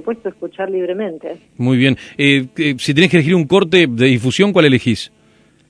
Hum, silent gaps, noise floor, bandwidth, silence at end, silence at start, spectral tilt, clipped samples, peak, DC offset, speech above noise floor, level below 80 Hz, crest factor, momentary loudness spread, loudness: none; none; -52 dBFS; 11 kHz; 0.65 s; 0.05 s; -6 dB/octave; under 0.1%; 0 dBFS; under 0.1%; 37 dB; -54 dBFS; 14 dB; 13 LU; -14 LUFS